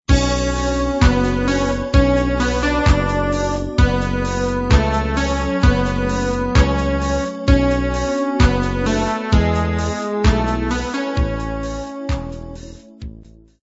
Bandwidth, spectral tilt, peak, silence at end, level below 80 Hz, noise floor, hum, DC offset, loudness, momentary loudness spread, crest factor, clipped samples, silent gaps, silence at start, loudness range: 8 kHz; -6 dB/octave; 0 dBFS; 0.35 s; -22 dBFS; -42 dBFS; none; under 0.1%; -18 LUFS; 9 LU; 16 dB; under 0.1%; none; 0.1 s; 4 LU